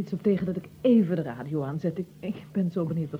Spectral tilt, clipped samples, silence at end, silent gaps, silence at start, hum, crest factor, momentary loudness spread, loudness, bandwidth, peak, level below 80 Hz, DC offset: -9.5 dB/octave; under 0.1%; 0 s; none; 0 s; none; 16 dB; 11 LU; -28 LUFS; 16.5 kHz; -12 dBFS; -62 dBFS; under 0.1%